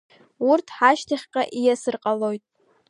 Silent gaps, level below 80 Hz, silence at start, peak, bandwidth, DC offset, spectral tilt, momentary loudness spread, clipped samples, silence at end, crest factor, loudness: none; -74 dBFS; 0.4 s; -2 dBFS; 11 kHz; under 0.1%; -4 dB/octave; 8 LU; under 0.1%; 0.5 s; 20 dB; -22 LUFS